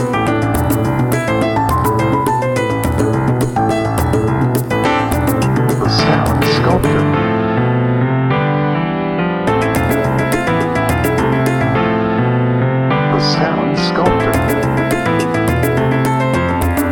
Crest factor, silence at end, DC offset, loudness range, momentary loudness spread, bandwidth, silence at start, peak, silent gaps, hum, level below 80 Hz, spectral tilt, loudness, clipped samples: 14 dB; 0 s; under 0.1%; 1 LU; 2 LU; 19 kHz; 0 s; 0 dBFS; none; none; -30 dBFS; -6.5 dB/octave; -14 LUFS; under 0.1%